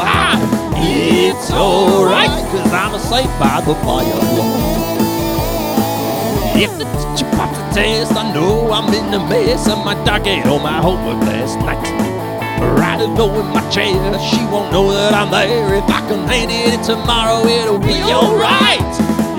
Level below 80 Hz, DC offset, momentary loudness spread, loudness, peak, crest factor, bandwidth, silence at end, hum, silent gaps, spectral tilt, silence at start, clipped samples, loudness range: -28 dBFS; under 0.1%; 5 LU; -14 LUFS; 0 dBFS; 14 dB; 19 kHz; 0 s; none; none; -5 dB/octave; 0 s; under 0.1%; 3 LU